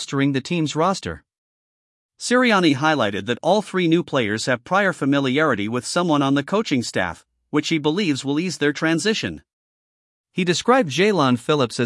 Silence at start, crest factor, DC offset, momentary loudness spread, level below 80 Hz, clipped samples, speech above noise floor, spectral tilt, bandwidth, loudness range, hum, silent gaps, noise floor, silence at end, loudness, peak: 0 s; 18 dB; under 0.1%; 8 LU; -60 dBFS; under 0.1%; over 70 dB; -5 dB/octave; 12 kHz; 3 LU; none; 1.38-2.09 s, 9.53-10.24 s; under -90 dBFS; 0 s; -20 LUFS; -4 dBFS